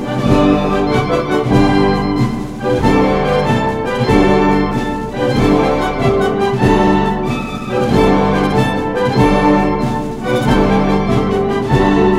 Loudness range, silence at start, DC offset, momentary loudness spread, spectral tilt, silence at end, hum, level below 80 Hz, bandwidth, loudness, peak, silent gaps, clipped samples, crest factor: 1 LU; 0 s; under 0.1%; 6 LU; -7 dB/octave; 0 s; none; -26 dBFS; 14.5 kHz; -14 LUFS; 0 dBFS; none; under 0.1%; 12 dB